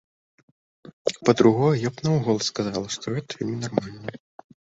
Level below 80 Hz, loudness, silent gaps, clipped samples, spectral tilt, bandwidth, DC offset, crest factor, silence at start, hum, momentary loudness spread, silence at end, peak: -58 dBFS; -24 LUFS; 0.93-1.05 s; under 0.1%; -6 dB/octave; 8 kHz; under 0.1%; 22 dB; 0.85 s; none; 12 LU; 0.55 s; -2 dBFS